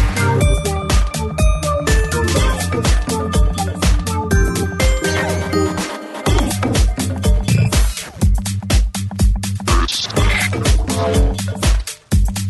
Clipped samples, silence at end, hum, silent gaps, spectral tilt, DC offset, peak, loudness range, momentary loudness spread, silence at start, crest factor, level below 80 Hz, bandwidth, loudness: under 0.1%; 0 s; none; none; -5 dB/octave; under 0.1%; -2 dBFS; 1 LU; 4 LU; 0 s; 12 dB; -18 dBFS; 12.5 kHz; -17 LUFS